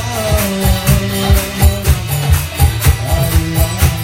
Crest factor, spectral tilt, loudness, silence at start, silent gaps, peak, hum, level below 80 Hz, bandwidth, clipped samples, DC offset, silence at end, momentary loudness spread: 12 dB; -5 dB/octave; -14 LUFS; 0 s; none; 0 dBFS; none; -18 dBFS; 17 kHz; under 0.1%; under 0.1%; 0 s; 3 LU